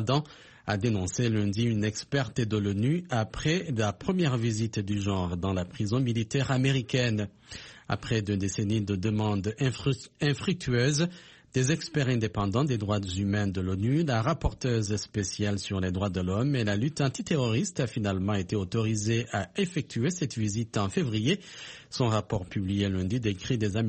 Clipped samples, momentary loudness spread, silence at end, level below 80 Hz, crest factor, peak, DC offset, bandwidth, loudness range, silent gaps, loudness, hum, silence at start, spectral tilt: under 0.1%; 5 LU; 0 s; -50 dBFS; 16 dB; -12 dBFS; under 0.1%; 8.8 kHz; 1 LU; none; -29 LUFS; none; 0 s; -5.5 dB/octave